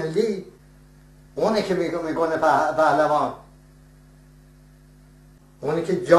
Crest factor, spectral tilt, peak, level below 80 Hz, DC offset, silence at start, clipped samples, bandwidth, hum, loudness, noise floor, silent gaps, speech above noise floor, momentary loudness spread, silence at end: 22 dB; -6 dB/octave; -2 dBFS; -54 dBFS; under 0.1%; 0 s; under 0.1%; 13 kHz; none; -22 LUFS; -50 dBFS; none; 30 dB; 13 LU; 0 s